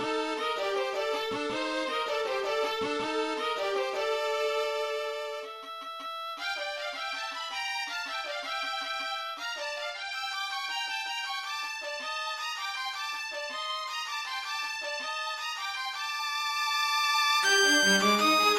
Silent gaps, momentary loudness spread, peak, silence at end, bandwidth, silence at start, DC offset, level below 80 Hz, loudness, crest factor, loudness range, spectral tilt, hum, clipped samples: none; 11 LU; -12 dBFS; 0 s; 16 kHz; 0 s; under 0.1%; -72 dBFS; -30 LUFS; 18 dB; 6 LU; -1.5 dB/octave; none; under 0.1%